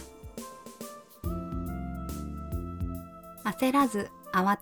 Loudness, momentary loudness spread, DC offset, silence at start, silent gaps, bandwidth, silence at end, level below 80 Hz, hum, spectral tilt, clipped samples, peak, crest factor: -32 LUFS; 18 LU; under 0.1%; 0 s; none; 19 kHz; 0 s; -44 dBFS; none; -6 dB/octave; under 0.1%; -12 dBFS; 20 dB